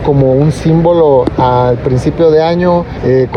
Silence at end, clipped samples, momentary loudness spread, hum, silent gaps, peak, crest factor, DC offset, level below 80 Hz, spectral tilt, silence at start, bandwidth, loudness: 0 s; under 0.1%; 4 LU; none; none; 0 dBFS; 8 dB; under 0.1%; -28 dBFS; -8.5 dB/octave; 0 s; 10.5 kHz; -10 LUFS